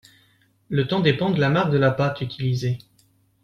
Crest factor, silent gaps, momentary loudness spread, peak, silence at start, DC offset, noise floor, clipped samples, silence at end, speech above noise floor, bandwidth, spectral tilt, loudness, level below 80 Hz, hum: 18 dB; none; 8 LU; -4 dBFS; 0.7 s; under 0.1%; -61 dBFS; under 0.1%; 0.65 s; 40 dB; 7.2 kHz; -7.5 dB/octave; -22 LUFS; -54 dBFS; none